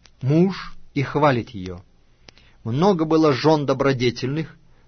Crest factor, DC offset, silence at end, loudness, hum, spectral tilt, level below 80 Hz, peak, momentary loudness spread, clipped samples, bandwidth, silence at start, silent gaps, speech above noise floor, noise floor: 16 dB; under 0.1%; 0.35 s; -20 LUFS; none; -7 dB/octave; -48 dBFS; -4 dBFS; 17 LU; under 0.1%; 6.6 kHz; 0.2 s; none; 31 dB; -51 dBFS